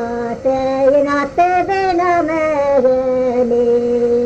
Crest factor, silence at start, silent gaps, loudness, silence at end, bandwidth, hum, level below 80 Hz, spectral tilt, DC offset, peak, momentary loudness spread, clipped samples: 12 dB; 0 s; none; -15 LUFS; 0 s; 8.2 kHz; none; -44 dBFS; -6 dB/octave; under 0.1%; -4 dBFS; 4 LU; under 0.1%